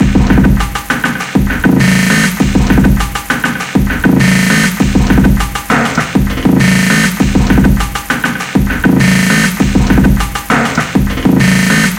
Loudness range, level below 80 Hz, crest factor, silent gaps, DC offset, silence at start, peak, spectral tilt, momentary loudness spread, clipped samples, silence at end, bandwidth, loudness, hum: 1 LU; -18 dBFS; 10 dB; none; under 0.1%; 0 s; 0 dBFS; -5 dB/octave; 6 LU; under 0.1%; 0 s; 17 kHz; -10 LUFS; none